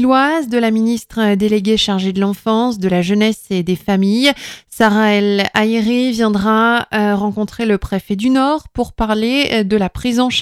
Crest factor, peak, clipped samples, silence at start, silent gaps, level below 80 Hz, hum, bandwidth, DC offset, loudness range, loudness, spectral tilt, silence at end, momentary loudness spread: 14 dB; 0 dBFS; under 0.1%; 0 s; none; -38 dBFS; none; 15 kHz; under 0.1%; 2 LU; -15 LUFS; -5.5 dB/octave; 0 s; 6 LU